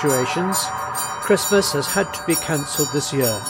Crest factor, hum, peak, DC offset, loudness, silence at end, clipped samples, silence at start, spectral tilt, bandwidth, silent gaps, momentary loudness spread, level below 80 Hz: 16 dB; none; -4 dBFS; under 0.1%; -20 LUFS; 0 s; under 0.1%; 0 s; -3.5 dB/octave; 17 kHz; none; 6 LU; -52 dBFS